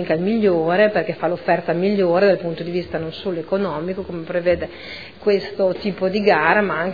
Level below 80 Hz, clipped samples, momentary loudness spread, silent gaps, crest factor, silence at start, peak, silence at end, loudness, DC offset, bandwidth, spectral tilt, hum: -50 dBFS; under 0.1%; 10 LU; none; 18 dB; 0 s; 0 dBFS; 0 s; -19 LUFS; 0.4%; 5 kHz; -8 dB/octave; none